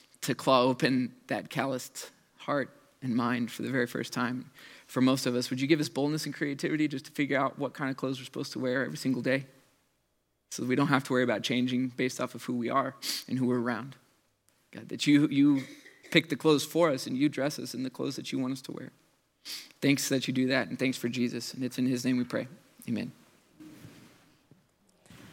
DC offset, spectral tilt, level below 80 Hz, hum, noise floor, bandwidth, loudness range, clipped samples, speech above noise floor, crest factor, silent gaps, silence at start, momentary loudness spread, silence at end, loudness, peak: under 0.1%; -5 dB/octave; -80 dBFS; none; -76 dBFS; 17 kHz; 5 LU; under 0.1%; 46 dB; 24 dB; none; 0.2 s; 15 LU; 0 s; -30 LUFS; -8 dBFS